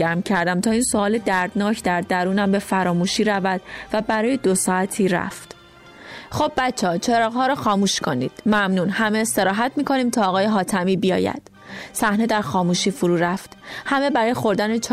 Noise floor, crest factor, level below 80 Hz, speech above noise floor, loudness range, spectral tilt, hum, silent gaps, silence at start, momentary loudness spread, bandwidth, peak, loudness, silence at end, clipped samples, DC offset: -45 dBFS; 12 dB; -52 dBFS; 25 dB; 2 LU; -4.5 dB/octave; none; none; 0 s; 7 LU; 15.5 kHz; -8 dBFS; -20 LUFS; 0 s; under 0.1%; under 0.1%